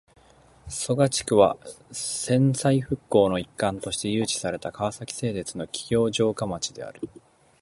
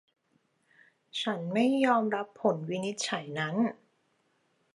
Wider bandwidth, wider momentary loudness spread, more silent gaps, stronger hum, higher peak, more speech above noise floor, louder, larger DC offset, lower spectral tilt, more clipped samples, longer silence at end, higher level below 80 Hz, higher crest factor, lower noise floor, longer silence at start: about the same, 11.5 kHz vs 11.5 kHz; first, 13 LU vs 8 LU; neither; neither; first, -4 dBFS vs -12 dBFS; second, 31 dB vs 44 dB; first, -25 LUFS vs -30 LUFS; neither; about the same, -5 dB/octave vs -5 dB/octave; neither; second, 0.55 s vs 1 s; first, -54 dBFS vs -84 dBFS; about the same, 22 dB vs 20 dB; second, -55 dBFS vs -73 dBFS; second, 0.65 s vs 1.15 s